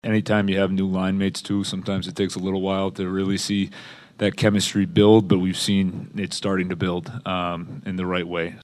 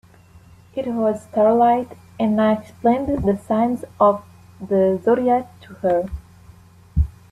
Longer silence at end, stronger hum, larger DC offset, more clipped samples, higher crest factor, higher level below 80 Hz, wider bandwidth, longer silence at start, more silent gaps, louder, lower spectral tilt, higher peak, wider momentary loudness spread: second, 0 s vs 0.2 s; neither; neither; neither; about the same, 20 dB vs 16 dB; second, -56 dBFS vs -36 dBFS; about the same, 13 kHz vs 12.5 kHz; second, 0.05 s vs 0.75 s; neither; second, -23 LUFS vs -20 LUFS; second, -5.5 dB/octave vs -8.5 dB/octave; about the same, -2 dBFS vs -4 dBFS; about the same, 10 LU vs 11 LU